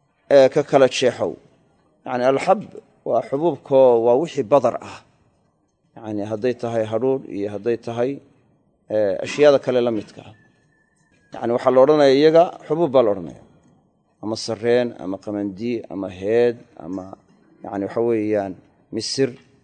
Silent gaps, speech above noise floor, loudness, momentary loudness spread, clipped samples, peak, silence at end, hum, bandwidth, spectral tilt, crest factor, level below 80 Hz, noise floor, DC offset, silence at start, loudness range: none; 46 dB; -19 LUFS; 18 LU; under 0.1%; 0 dBFS; 0.3 s; none; 9.4 kHz; -5.5 dB/octave; 20 dB; -64 dBFS; -65 dBFS; under 0.1%; 0.3 s; 7 LU